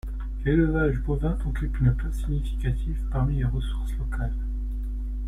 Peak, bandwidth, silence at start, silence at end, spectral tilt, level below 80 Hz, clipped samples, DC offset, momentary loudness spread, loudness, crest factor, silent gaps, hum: -10 dBFS; 10.5 kHz; 0.05 s; 0 s; -8.5 dB/octave; -28 dBFS; under 0.1%; under 0.1%; 9 LU; -27 LUFS; 16 dB; none; none